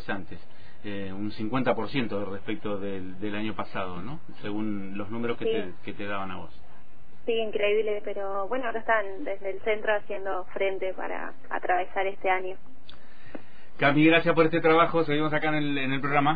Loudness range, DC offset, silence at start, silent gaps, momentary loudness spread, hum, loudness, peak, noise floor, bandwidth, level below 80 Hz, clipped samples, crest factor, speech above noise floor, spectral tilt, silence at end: 9 LU; 4%; 0 s; none; 17 LU; none; -28 LUFS; -6 dBFS; -54 dBFS; 5 kHz; -58 dBFS; under 0.1%; 20 dB; 26 dB; -9 dB/octave; 0 s